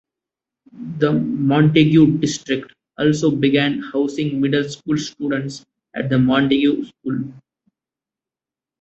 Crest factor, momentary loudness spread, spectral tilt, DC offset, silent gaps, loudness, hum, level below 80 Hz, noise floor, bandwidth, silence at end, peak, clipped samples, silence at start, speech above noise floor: 16 dB; 13 LU; -6.5 dB/octave; under 0.1%; none; -18 LUFS; none; -54 dBFS; -89 dBFS; 8.2 kHz; 1.4 s; -2 dBFS; under 0.1%; 0.75 s; 72 dB